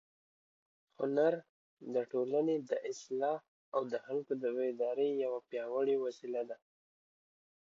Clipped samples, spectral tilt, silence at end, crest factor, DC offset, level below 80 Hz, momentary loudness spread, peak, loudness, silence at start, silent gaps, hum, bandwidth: under 0.1%; -5 dB/octave; 1.1 s; 18 dB; under 0.1%; -90 dBFS; 8 LU; -18 dBFS; -36 LUFS; 1 s; 1.49-1.77 s, 3.48-3.72 s; none; 7.6 kHz